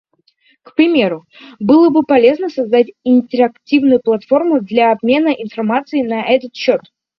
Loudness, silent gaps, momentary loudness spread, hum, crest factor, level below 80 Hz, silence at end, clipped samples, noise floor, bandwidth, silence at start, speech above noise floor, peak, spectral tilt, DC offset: -14 LUFS; none; 8 LU; none; 14 dB; -58 dBFS; 0.4 s; under 0.1%; -56 dBFS; 6 kHz; 0.8 s; 43 dB; 0 dBFS; -7 dB/octave; under 0.1%